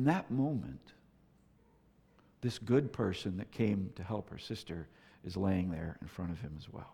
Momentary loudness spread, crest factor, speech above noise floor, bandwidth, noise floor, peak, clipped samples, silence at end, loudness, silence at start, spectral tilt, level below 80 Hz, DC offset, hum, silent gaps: 14 LU; 20 dB; 31 dB; 14.5 kHz; -67 dBFS; -16 dBFS; under 0.1%; 0 s; -37 LUFS; 0 s; -7.5 dB/octave; -60 dBFS; under 0.1%; none; none